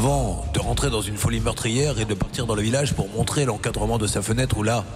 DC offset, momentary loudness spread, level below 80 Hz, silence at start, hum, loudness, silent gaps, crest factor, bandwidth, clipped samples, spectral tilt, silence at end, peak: under 0.1%; 3 LU; -32 dBFS; 0 s; none; -23 LUFS; none; 12 dB; 16 kHz; under 0.1%; -5 dB/octave; 0 s; -10 dBFS